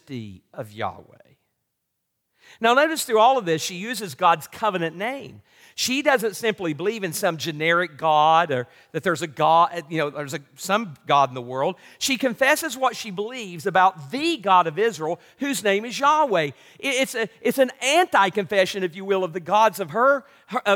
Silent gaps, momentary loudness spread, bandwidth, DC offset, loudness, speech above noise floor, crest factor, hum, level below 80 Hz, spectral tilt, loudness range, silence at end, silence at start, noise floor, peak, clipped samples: none; 12 LU; 18 kHz; under 0.1%; -22 LUFS; 55 dB; 18 dB; none; -74 dBFS; -3.5 dB/octave; 3 LU; 0 s; 0.1 s; -77 dBFS; -6 dBFS; under 0.1%